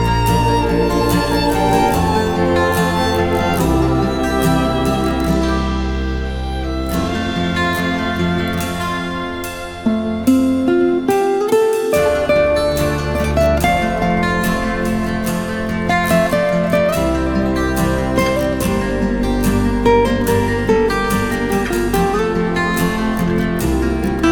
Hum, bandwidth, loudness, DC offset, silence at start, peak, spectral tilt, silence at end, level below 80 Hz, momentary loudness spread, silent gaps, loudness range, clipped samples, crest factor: none; over 20 kHz; -16 LUFS; under 0.1%; 0 s; 0 dBFS; -6 dB/octave; 0 s; -26 dBFS; 6 LU; none; 4 LU; under 0.1%; 16 dB